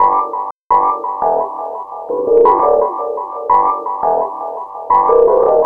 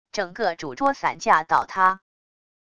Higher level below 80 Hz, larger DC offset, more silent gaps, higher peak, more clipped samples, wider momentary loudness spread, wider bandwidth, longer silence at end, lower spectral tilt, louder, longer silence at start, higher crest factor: first, -50 dBFS vs -62 dBFS; about the same, 0.4% vs 0.3%; first, 0.51-0.70 s vs none; first, 0 dBFS vs -4 dBFS; neither; first, 14 LU vs 8 LU; second, 3.2 kHz vs 11 kHz; second, 0 s vs 0.75 s; first, -8.5 dB/octave vs -3.5 dB/octave; first, -14 LUFS vs -22 LUFS; second, 0 s vs 0.15 s; second, 14 dB vs 20 dB